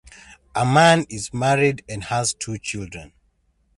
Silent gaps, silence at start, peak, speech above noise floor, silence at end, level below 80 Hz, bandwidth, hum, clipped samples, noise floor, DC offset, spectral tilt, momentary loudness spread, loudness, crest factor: none; 0.3 s; -2 dBFS; 44 dB; 0.75 s; -50 dBFS; 11.5 kHz; none; under 0.1%; -64 dBFS; under 0.1%; -4.5 dB/octave; 16 LU; -20 LUFS; 20 dB